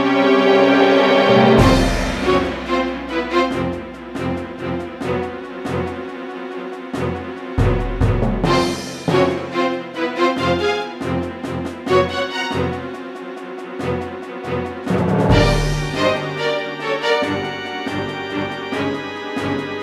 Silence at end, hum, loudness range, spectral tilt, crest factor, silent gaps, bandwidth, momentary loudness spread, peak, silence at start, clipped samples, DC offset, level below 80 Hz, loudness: 0 s; none; 8 LU; -6 dB/octave; 18 dB; none; 14.5 kHz; 15 LU; -2 dBFS; 0 s; under 0.1%; under 0.1%; -32 dBFS; -19 LUFS